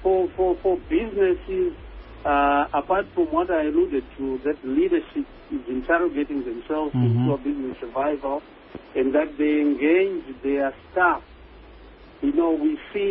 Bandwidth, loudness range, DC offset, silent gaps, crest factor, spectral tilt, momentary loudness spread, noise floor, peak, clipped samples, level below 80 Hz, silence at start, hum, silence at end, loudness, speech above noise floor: 4.5 kHz; 2 LU; under 0.1%; none; 16 dB; -11.5 dB/octave; 9 LU; -46 dBFS; -6 dBFS; under 0.1%; -46 dBFS; 0 s; none; 0 s; -23 LUFS; 23 dB